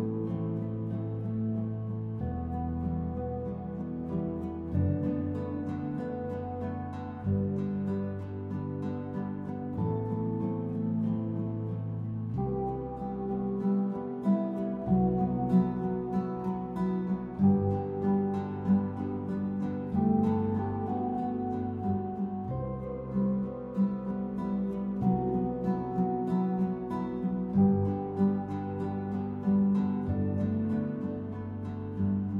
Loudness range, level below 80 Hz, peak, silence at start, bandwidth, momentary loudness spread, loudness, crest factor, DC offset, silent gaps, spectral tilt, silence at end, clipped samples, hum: 5 LU; -52 dBFS; -14 dBFS; 0 s; 4.2 kHz; 9 LU; -32 LUFS; 16 dB; under 0.1%; none; -11.5 dB/octave; 0 s; under 0.1%; none